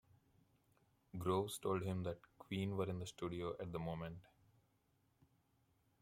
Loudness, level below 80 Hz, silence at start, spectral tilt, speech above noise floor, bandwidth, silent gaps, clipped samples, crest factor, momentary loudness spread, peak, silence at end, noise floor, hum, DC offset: -44 LUFS; -72 dBFS; 1.15 s; -6 dB/octave; 36 dB; 16.5 kHz; none; under 0.1%; 20 dB; 11 LU; -24 dBFS; 1.8 s; -79 dBFS; none; under 0.1%